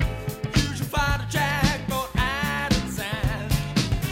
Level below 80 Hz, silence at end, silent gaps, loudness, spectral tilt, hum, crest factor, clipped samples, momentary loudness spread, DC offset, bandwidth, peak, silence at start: -32 dBFS; 0 s; none; -25 LUFS; -4.5 dB/octave; none; 18 dB; under 0.1%; 4 LU; under 0.1%; 16 kHz; -6 dBFS; 0 s